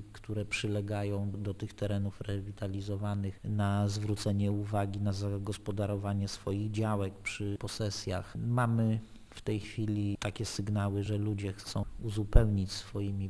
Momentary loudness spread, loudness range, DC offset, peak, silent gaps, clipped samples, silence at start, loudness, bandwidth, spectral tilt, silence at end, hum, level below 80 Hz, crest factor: 8 LU; 2 LU; under 0.1%; -6 dBFS; none; under 0.1%; 0 s; -34 LUFS; 11 kHz; -6.5 dB/octave; 0 s; none; -42 dBFS; 26 dB